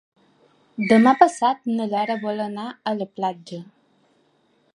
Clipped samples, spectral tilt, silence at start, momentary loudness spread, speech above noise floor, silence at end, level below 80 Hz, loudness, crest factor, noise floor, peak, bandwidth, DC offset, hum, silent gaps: under 0.1%; -5.5 dB/octave; 0.8 s; 20 LU; 43 dB; 1.1 s; -70 dBFS; -21 LUFS; 22 dB; -63 dBFS; 0 dBFS; 10.5 kHz; under 0.1%; none; none